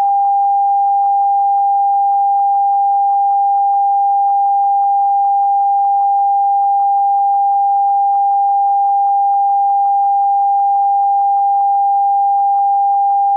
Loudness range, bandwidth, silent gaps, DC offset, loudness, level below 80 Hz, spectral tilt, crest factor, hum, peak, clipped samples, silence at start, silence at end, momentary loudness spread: 0 LU; 1.4 kHz; none; under 0.1%; -13 LUFS; -86 dBFS; -4 dB/octave; 4 dB; none; -8 dBFS; under 0.1%; 0 s; 0 s; 0 LU